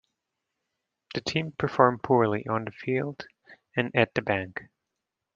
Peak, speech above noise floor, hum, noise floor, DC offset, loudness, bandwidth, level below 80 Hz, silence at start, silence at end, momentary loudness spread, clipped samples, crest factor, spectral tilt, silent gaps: -4 dBFS; 59 dB; none; -85 dBFS; under 0.1%; -27 LUFS; 7.6 kHz; -64 dBFS; 1.1 s; 0.7 s; 15 LU; under 0.1%; 26 dB; -6.5 dB/octave; none